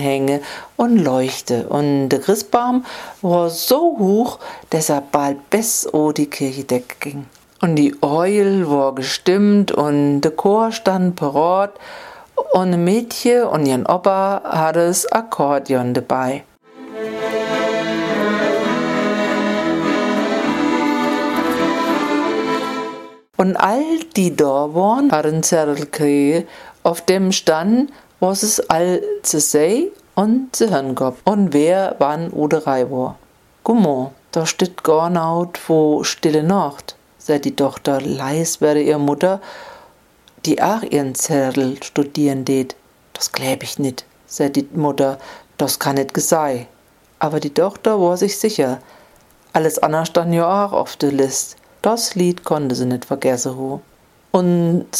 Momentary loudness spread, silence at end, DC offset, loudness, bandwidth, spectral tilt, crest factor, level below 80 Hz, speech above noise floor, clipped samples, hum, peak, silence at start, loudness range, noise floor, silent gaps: 8 LU; 0 s; under 0.1%; -17 LUFS; 16 kHz; -5 dB/octave; 18 dB; -60 dBFS; 34 dB; under 0.1%; none; 0 dBFS; 0 s; 3 LU; -51 dBFS; none